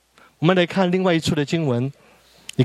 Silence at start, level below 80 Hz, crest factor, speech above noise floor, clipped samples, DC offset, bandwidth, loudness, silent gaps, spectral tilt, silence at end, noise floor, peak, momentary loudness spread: 0.4 s; -56 dBFS; 20 dB; 24 dB; under 0.1%; under 0.1%; 13 kHz; -20 LUFS; none; -6.5 dB/octave; 0 s; -43 dBFS; -2 dBFS; 11 LU